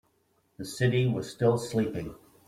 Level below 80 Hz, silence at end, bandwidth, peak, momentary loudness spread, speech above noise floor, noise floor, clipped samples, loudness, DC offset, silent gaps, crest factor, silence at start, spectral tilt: -58 dBFS; 0.3 s; 15 kHz; -12 dBFS; 15 LU; 43 dB; -70 dBFS; under 0.1%; -28 LUFS; under 0.1%; none; 16 dB; 0.6 s; -6.5 dB/octave